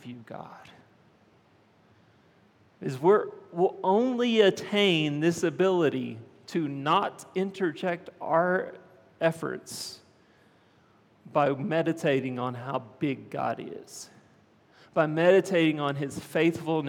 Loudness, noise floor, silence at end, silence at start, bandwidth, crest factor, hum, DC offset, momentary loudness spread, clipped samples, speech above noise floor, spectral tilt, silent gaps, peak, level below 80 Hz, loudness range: -27 LUFS; -62 dBFS; 0 s; 0.05 s; 16.5 kHz; 20 dB; none; under 0.1%; 16 LU; under 0.1%; 35 dB; -5.5 dB/octave; none; -8 dBFS; -76 dBFS; 7 LU